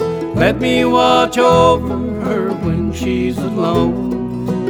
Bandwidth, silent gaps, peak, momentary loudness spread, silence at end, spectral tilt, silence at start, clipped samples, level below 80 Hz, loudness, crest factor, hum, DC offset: 18 kHz; none; 0 dBFS; 9 LU; 0 s; -6 dB/octave; 0 s; under 0.1%; -34 dBFS; -15 LUFS; 14 dB; none; under 0.1%